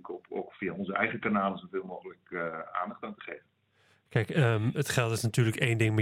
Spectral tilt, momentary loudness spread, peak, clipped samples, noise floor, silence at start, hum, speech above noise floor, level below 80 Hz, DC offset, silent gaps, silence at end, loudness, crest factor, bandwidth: -6 dB/octave; 15 LU; -10 dBFS; under 0.1%; -68 dBFS; 0.05 s; none; 38 dB; -66 dBFS; under 0.1%; none; 0 s; -31 LUFS; 22 dB; 16 kHz